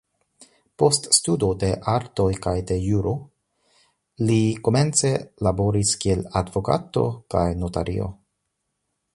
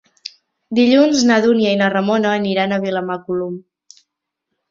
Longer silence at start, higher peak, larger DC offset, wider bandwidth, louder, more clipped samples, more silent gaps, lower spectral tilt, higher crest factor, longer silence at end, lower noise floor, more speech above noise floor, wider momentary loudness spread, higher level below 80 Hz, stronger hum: about the same, 0.8 s vs 0.7 s; about the same, -2 dBFS vs -2 dBFS; neither; first, 11.5 kHz vs 7.6 kHz; second, -22 LUFS vs -16 LUFS; neither; neither; about the same, -5 dB/octave vs -5 dB/octave; first, 22 dB vs 16 dB; about the same, 1 s vs 1.1 s; about the same, -77 dBFS vs -77 dBFS; second, 55 dB vs 62 dB; second, 8 LU vs 19 LU; first, -40 dBFS vs -60 dBFS; neither